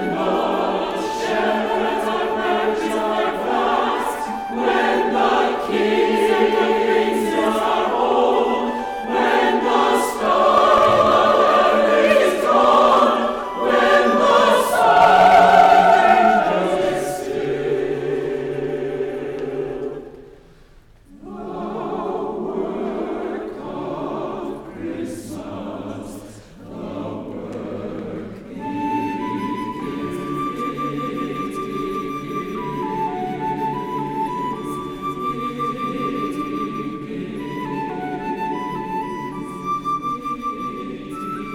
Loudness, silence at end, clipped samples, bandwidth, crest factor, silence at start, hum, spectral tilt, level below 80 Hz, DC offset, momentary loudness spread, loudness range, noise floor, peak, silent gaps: -19 LUFS; 0 s; under 0.1%; 18.5 kHz; 16 dB; 0 s; none; -5 dB/octave; -50 dBFS; under 0.1%; 16 LU; 15 LU; -48 dBFS; -2 dBFS; none